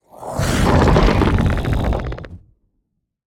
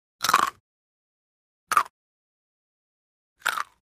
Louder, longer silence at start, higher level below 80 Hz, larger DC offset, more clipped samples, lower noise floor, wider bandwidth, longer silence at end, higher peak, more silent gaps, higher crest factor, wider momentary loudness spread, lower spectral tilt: first, -17 LUFS vs -25 LUFS; about the same, 0.2 s vs 0.2 s; first, -24 dBFS vs -70 dBFS; neither; neither; second, -71 dBFS vs under -90 dBFS; about the same, 17 kHz vs 15.5 kHz; first, 0.9 s vs 0.35 s; first, 0 dBFS vs -4 dBFS; second, none vs 0.60-1.67 s, 1.90-3.36 s; second, 18 dB vs 28 dB; first, 14 LU vs 10 LU; first, -6.5 dB/octave vs 0 dB/octave